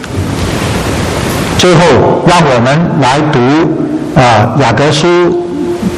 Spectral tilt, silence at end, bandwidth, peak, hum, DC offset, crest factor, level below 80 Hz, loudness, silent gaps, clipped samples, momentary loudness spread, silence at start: -5.5 dB/octave; 0 s; 14.5 kHz; 0 dBFS; none; under 0.1%; 8 dB; -28 dBFS; -8 LUFS; none; 0.4%; 7 LU; 0 s